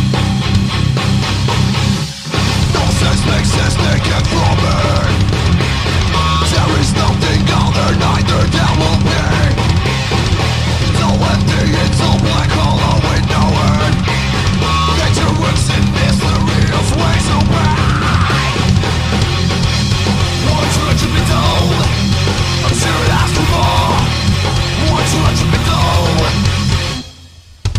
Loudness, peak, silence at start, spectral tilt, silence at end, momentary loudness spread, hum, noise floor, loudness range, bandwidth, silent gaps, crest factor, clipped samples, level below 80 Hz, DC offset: -13 LUFS; 0 dBFS; 0 s; -5 dB/octave; 0 s; 2 LU; none; -38 dBFS; 1 LU; 15.5 kHz; none; 12 dB; under 0.1%; -22 dBFS; under 0.1%